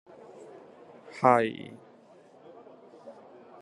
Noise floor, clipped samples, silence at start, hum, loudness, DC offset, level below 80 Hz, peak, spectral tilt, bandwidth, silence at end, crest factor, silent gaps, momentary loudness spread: -56 dBFS; under 0.1%; 1.15 s; none; -25 LUFS; under 0.1%; -78 dBFS; -6 dBFS; -6.5 dB/octave; 11 kHz; 0.5 s; 28 dB; none; 29 LU